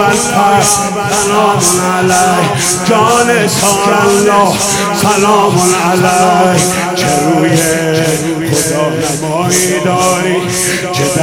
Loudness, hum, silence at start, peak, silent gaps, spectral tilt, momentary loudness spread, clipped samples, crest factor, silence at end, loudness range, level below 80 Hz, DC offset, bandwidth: -10 LUFS; none; 0 s; 0 dBFS; none; -3.5 dB/octave; 4 LU; 0.5%; 10 dB; 0 s; 2 LU; -42 dBFS; under 0.1%; over 20 kHz